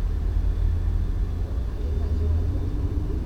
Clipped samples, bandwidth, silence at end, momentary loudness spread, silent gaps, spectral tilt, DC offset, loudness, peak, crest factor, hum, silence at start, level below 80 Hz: under 0.1%; 6.4 kHz; 0 s; 4 LU; none; -9 dB/octave; under 0.1%; -27 LUFS; -12 dBFS; 12 dB; none; 0 s; -26 dBFS